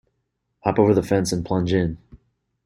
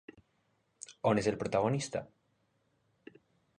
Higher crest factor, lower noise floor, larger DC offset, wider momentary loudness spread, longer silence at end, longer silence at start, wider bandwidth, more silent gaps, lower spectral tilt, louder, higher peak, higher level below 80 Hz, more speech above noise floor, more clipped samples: about the same, 20 dB vs 22 dB; about the same, -75 dBFS vs -76 dBFS; neither; second, 10 LU vs 17 LU; second, 0.5 s vs 1.55 s; second, 0.65 s vs 0.9 s; first, 16 kHz vs 10 kHz; neither; about the same, -6.5 dB/octave vs -5.5 dB/octave; first, -21 LUFS vs -33 LUFS; first, -4 dBFS vs -14 dBFS; first, -48 dBFS vs -66 dBFS; first, 55 dB vs 44 dB; neither